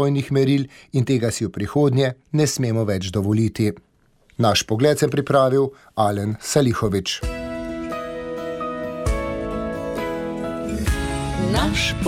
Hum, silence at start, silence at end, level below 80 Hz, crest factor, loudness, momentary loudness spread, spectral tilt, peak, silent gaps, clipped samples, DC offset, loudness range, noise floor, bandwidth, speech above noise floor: none; 0 s; 0 s; -34 dBFS; 18 dB; -22 LUFS; 10 LU; -5.5 dB/octave; -4 dBFS; none; under 0.1%; under 0.1%; 7 LU; -57 dBFS; 16 kHz; 37 dB